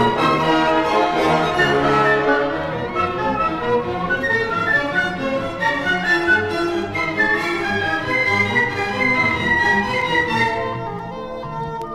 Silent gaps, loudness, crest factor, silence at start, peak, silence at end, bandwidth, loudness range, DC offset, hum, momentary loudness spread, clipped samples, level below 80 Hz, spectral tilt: none; -18 LUFS; 14 dB; 0 s; -4 dBFS; 0 s; 15.5 kHz; 2 LU; under 0.1%; none; 8 LU; under 0.1%; -44 dBFS; -5 dB/octave